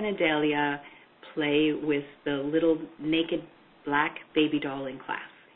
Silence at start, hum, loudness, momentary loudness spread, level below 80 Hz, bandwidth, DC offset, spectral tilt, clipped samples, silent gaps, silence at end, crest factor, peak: 0 s; none; -28 LUFS; 11 LU; -64 dBFS; 4.1 kHz; under 0.1%; -9.5 dB/octave; under 0.1%; none; 0.3 s; 20 dB; -8 dBFS